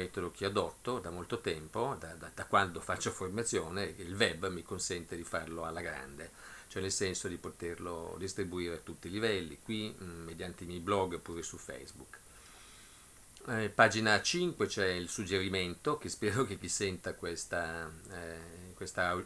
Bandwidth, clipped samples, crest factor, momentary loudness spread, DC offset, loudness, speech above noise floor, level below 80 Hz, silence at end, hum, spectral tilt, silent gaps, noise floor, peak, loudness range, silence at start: 11 kHz; under 0.1%; 28 dB; 16 LU; under 0.1%; -36 LUFS; 20 dB; -62 dBFS; 0 s; none; -3.5 dB/octave; none; -57 dBFS; -10 dBFS; 7 LU; 0 s